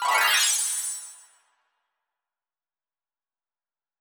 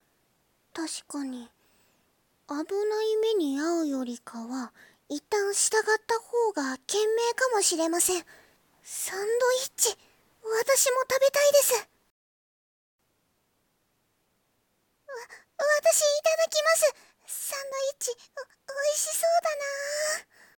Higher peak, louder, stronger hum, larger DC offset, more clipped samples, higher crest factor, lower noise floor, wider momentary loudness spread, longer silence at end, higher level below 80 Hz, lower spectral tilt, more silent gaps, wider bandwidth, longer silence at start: about the same, -8 dBFS vs -10 dBFS; first, -21 LUFS vs -26 LUFS; neither; neither; neither; about the same, 20 dB vs 20 dB; first, under -90 dBFS vs -73 dBFS; about the same, 17 LU vs 16 LU; first, 2.85 s vs 0.35 s; second, -88 dBFS vs -76 dBFS; second, 4.5 dB/octave vs 0 dB/octave; second, none vs 12.11-12.99 s; first, over 20 kHz vs 18 kHz; second, 0 s vs 0.75 s